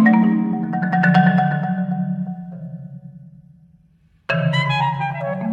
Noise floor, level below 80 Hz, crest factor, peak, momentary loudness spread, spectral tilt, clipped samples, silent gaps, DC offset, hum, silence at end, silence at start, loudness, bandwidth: -56 dBFS; -58 dBFS; 16 dB; -2 dBFS; 20 LU; -8 dB/octave; under 0.1%; none; under 0.1%; none; 0 s; 0 s; -19 LUFS; 7.4 kHz